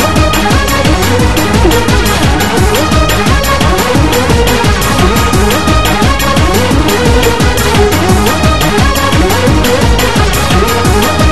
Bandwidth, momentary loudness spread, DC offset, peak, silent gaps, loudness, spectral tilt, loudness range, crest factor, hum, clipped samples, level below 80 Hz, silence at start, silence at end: 13.5 kHz; 1 LU; 8%; 0 dBFS; none; -9 LUFS; -4.5 dB/octave; 0 LU; 8 dB; none; 0.6%; -14 dBFS; 0 s; 0 s